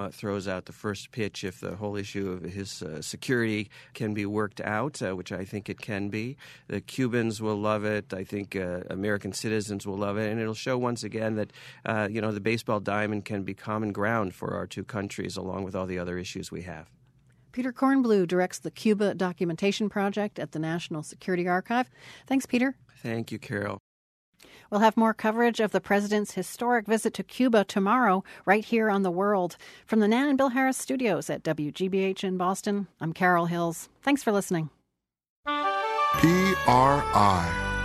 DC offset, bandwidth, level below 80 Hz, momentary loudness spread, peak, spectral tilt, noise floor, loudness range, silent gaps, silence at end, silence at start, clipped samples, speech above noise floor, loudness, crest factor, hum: under 0.1%; 13.5 kHz; -54 dBFS; 12 LU; -6 dBFS; -5.5 dB/octave; -81 dBFS; 7 LU; 23.80-24.33 s, 35.29-35.43 s; 0 s; 0 s; under 0.1%; 53 dB; -28 LUFS; 22 dB; none